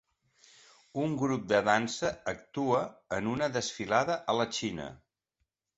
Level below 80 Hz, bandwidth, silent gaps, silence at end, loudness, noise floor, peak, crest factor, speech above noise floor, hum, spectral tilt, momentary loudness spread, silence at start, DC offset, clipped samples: -64 dBFS; 8.2 kHz; none; 0.8 s; -31 LUFS; -82 dBFS; -10 dBFS; 22 dB; 51 dB; none; -4.5 dB/octave; 9 LU; 0.95 s; under 0.1%; under 0.1%